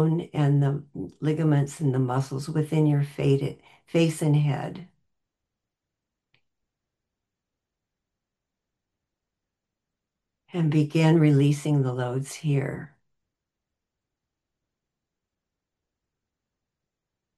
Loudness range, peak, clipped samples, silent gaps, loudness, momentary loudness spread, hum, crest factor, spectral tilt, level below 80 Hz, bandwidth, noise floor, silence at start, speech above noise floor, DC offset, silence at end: 10 LU; -8 dBFS; under 0.1%; none; -24 LUFS; 12 LU; none; 18 dB; -7.5 dB/octave; -66 dBFS; 12.5 kHz; -86 dBFS; 0 s; 63 dB; under 0.1%; 4.5 s